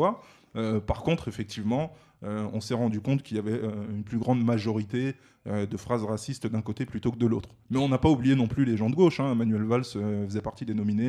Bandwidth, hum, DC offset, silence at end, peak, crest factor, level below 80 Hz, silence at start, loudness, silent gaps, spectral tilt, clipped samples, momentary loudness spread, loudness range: 12 kHz; none; under 0.1%; 0 s; -8 dBFS; 18 dB; -50 dBFS; 0 s; -28 LUFS; none; -7.5 dB/octave; under 0.1%; 10 LU; 5 LU